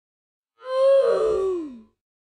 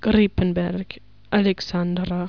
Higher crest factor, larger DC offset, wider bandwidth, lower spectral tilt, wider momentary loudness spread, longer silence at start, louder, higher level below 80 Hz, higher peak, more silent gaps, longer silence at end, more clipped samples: about the same, 12 dB vs 16 dB; second, under 0.1% vs 0.5%; first, 10 kHz vs 5.4 kHz; second, -5 dB/octave vs -7.5 dB/octave; first, 18 LU vs 13 LU; first, 0.65 s vs 0 s; about the same, -21 LUFS vs -22 LUFS; second, -58 dBFS vs -40 dBFS; second, -10 dBFS vs -6 dBFS; neither; first, 0.55 s vs 0 s; neither